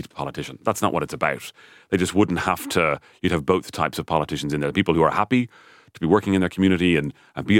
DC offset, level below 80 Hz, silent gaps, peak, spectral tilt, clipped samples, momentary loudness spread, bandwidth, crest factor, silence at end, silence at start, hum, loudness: under 0.1%; -48 dBFS; none; -4 dBFS; -5.5 dB/octave; under 0.1%; 11 LU; 17 kHz; 18 dB; 0 s; 0 s; none; -22 LUFS